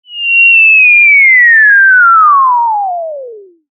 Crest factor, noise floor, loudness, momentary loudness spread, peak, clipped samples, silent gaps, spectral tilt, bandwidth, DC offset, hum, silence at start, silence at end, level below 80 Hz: 6 dB; -29 dBFS; -3 LUFS; 13 LU; 0 dBFS; under 0.1%; none; 0 dB/octave; 3.3 kHz; under 0.1%; none; 0.1 s; 0.35 s; -84 dBFS